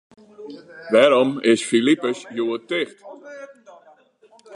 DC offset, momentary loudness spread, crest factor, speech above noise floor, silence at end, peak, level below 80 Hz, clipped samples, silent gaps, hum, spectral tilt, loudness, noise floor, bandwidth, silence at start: under 0.1%; 24 LU; 20 dB; 35 dB; 0 s; 0 dBFS; -76 dBFS; under 0.1%; none; none; -4 dB/octave; -19 LUFS; -54 dBFS; 11 kHz; 0.4 s